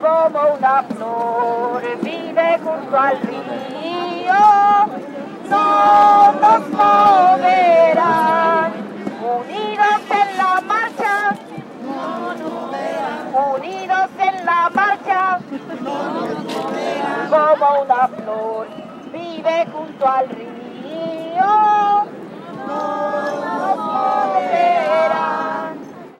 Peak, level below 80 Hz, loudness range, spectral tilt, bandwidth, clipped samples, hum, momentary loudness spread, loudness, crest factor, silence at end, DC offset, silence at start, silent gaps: -2 dBFS; -68 dBFS; 8 LU; -5 dB/octave; 12 kHz; under 0.1%; none; 15 LU; -16 LUFS; 14 dB; 0.1 s; under 0.1%; 0 s; none